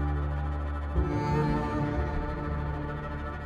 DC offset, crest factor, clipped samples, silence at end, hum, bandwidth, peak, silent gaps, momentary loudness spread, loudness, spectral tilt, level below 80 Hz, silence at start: under 0.1%; 14 dB; under 0.1%; 0 s; none; 7.2 kHz; -16 dBFS; none; 7 LU; -31 LUFS; -8.5 dB/octave; -34 dBFS; 0 s